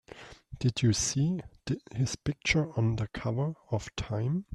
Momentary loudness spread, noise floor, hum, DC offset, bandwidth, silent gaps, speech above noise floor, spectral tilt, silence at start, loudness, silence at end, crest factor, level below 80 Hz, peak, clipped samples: 10 LU; -50 dBFS; none; under 0.1%; 12 kHz; none; 20 dB; -5 dB/octave; 0.15 s; -31 LUFS; 0 s; 18 dB; -50 dBFS; -12 dBFS; under 0.1%